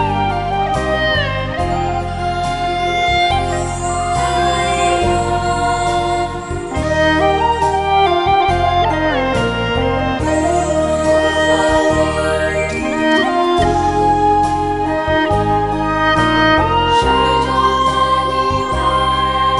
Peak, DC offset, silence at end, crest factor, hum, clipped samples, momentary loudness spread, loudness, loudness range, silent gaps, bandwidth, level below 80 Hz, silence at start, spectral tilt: 0 dBFS; under 0.1%; 0 s; 14 dB; none; under 0.1%; 5 LU; -15 LUFS; 3 LU; none; 11.5 kHz; -30 dBFS; 0 s; -5 dB/octave